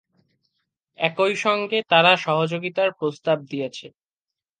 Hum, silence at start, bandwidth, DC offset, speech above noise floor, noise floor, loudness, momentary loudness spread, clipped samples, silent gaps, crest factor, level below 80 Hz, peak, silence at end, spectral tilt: none; 1 s; 9.4 kHz; under 0.1%; 67 dB; -89 dBFS; -21 LUFS; 14 LU; under 0.1%; none; 22 dB; -76 dBFS; -2 dBFS; 0.7 s; -4.5 dB/octave